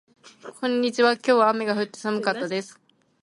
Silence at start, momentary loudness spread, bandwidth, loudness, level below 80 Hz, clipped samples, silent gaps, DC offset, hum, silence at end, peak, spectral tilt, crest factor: 0.45 s; 18 LU; 11.5 kHz; -23 LUFS; -76 dBFS; under 0.1%; none; under 0.1%; none; 0.5 s; -6 dBFS; -4.5 dB/octave; 18 dB